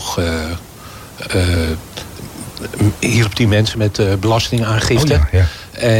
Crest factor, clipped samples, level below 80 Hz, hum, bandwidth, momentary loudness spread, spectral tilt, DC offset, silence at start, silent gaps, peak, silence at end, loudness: 12 dB; under 0.1%; -28 dBFS; none; 17 kHz; 16 LU; -5.5 dB/octave; under 0.1%; 0 s; none; -4 dBFS; 0 s; -16 LUFS